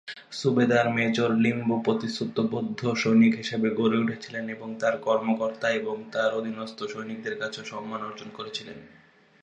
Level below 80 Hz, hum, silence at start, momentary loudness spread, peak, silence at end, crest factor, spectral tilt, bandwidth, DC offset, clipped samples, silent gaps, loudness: -70 dBFS; none; 0.05 s; 13 LU; -8 dBFS; 0.55 s; 18 dB; -6 dB/octave; 8.2 kHz; under 0.1%; under 0.1%; none; -26 LUFS